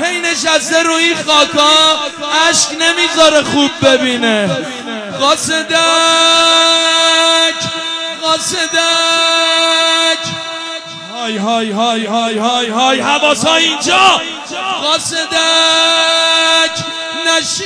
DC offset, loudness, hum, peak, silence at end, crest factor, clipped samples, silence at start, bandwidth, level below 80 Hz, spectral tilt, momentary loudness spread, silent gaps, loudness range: under 0.1%; -10 LUFS; none; 0 dBFS; 0 s; 12 dB; under 0.1%; 0 s; 11 kHz; -54 dBFS; -1.5 dB/octave; 10 LU; none; 3 LU